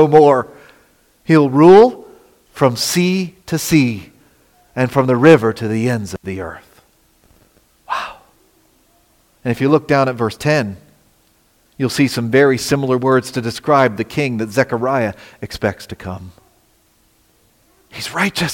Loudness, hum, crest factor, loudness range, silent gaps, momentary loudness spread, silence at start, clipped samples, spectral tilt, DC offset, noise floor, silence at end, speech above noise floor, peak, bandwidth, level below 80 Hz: -15 LUFS; none; 16 dB; 12 LU; none; 20 LU; 0 s; under 0.1%; -5.5 dB/octave; under 0.1%; -56 dBFS; 0 s; 42 dB; 0 dBFS; 17 kHz; -52 dBFS